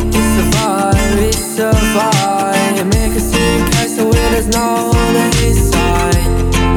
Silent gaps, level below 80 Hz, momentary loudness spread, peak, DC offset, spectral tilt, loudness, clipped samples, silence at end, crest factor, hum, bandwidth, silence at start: none; -18 dBFS; 2 LU; 0 dBFS; under 0.1%; -4.5 dB/octave; -13 LUFS; under 0.1%; 0 s; 12 dB; none; 19.5 kHz; 0 s